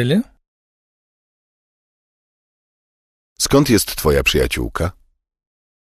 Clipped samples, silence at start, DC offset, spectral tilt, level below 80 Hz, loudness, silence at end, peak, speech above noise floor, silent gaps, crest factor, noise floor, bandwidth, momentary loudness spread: under 0.1%; 0 s; under 0.1%; -4.5 dB/octave; -34 dBFS; -17 LUFS; 1.05 s; -2 dBFS; over 74 dB; 0.47-3.36 s; 18 dB; under -90 dBFS; 14.5 kHz; 11 LU